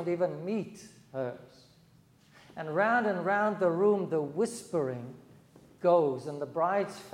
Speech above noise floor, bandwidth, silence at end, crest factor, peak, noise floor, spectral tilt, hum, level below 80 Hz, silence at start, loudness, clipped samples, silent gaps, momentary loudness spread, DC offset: 31 dB; 14.5 kHz; 0 s; 18 dB; -14 dBFS; -61 dBFS; -6.5 dB/octave; none; -76 dBFS; 0 s; -30 LUFS; under 0.1%; none; 16 LU; under 0.1%